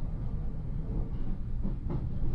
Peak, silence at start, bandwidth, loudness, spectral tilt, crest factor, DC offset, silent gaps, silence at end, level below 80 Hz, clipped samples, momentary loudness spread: -20 dBFS; 0 s; 2.9 kHz; -37 LUFS; -11 dB/octave; 12 dB; under 0.1%; none; 0 s; -34 dBFS; under 0.1%; 3 LU